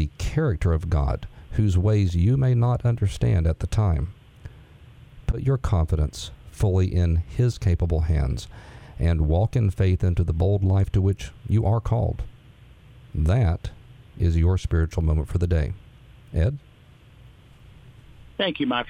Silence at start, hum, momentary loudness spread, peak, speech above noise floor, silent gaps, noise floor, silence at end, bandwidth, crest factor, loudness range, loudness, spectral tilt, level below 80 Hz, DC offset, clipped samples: 0 s; none; 11 LU; -8 dBFS; 29 dB; none; -50 dBFS; 0 s; 10.5 kHz; 14 dB; 4 LU; -24 LUFS; -7.5 dB/octave; -32 dBFS; under 0.1%; under 0.1%